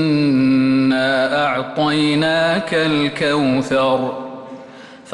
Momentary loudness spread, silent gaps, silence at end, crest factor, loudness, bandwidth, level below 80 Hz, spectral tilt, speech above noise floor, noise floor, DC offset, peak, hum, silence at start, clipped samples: 13 LU; none; 0 s; 10 dB; -16 LUFS; 11.5 kHz; -54 dBFS; -6 dB/octave; 22 dB; -38 dBFS; under 0.1%; -6 dBFS; none; 0 s; under 0.1%